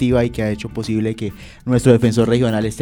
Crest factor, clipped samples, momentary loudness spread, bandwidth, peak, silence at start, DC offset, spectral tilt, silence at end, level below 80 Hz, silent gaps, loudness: 16 dB; under 0.1%; 13 LU; 16 kHz; 0 dBFS; 0 s; under 0.1%; -7 dB/octave; 0 s; -38 dBFS; none; -17 LUFS